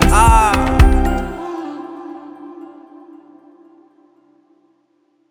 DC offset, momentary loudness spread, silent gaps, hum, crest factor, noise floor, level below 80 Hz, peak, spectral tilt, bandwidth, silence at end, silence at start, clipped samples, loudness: under 0.1%; 25 LU; none; none; 16 dB; -61 dBFS; -20 dBFS; 0 dBFS; -5.5 dB/octave; over 20 kHz; 2.65 s; 0 s; under 0.1%; -15 LUFS